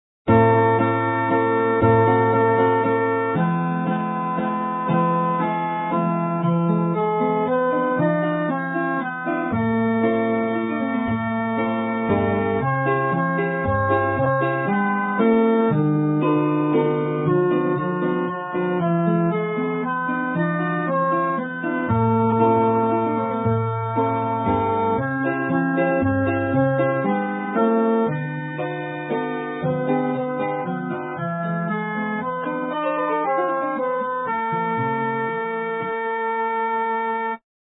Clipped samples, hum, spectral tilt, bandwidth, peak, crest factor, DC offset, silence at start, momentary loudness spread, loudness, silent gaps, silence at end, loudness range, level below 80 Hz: under 0.1%; none; -12.5 dB/octave; 4 kHz; -4 dBFS; 18 dB; under 0.1%; 0.25 s; 7 LU; -21 LUFS; none; 0.4 s; 4 LU; -54 dBFS